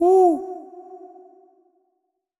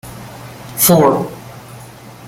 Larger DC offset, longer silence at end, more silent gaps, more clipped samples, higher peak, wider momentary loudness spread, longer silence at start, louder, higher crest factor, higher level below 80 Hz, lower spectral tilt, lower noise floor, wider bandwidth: neither; first, 1.45 s vs 0 s; neither; neither; second, -8 dBFS vs 0 dBFS; about the same, 27 LU vs 25 LU; about the same, 0 s vs 0.05 s; second, -18 LUFS vs -12 LUFS; about the same, 16 dB vs 18 dB; second, -74 dBFS vs -48 dBFS; first, -6.5 dB/octave vs -4.5 dB/octave; first, -75 dBFS vs -36 dBFS; second, 11.5 kHz vs 17 kHz